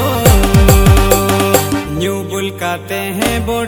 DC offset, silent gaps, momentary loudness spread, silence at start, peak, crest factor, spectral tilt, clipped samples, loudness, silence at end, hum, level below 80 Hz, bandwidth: under 0.1%; none; 10 LU; 0 s; 0 dBFS; 12 dB; -5 dB/octave; 0.4%; -12 LUFS; 0 s; none; -18 dBFS; over 20 kHz